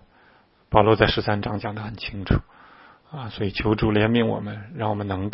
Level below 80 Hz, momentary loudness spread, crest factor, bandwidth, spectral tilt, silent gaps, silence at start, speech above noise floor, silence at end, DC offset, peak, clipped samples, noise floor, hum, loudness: -38 dBFS; 13 LU; 24 dB; 5.8 kHz; -11 dB/octave; none; 0.7 s; 35 dB; 0 s; under 0.1%; 0 dBFS; under 0.1%; -57 dBFS; none; -23 LUFS